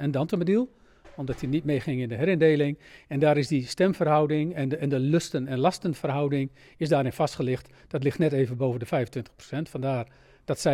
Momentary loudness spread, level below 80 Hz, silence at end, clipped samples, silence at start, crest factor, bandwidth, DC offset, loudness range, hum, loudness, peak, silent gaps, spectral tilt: 12 LU; -58 dBFS; 0 s; under 0.1%; 0 s; 16 dB; 14 kHz; under 0.1%; 3 LU; none; -26 LUFS; -10 dBFS; none; -7 dB/octave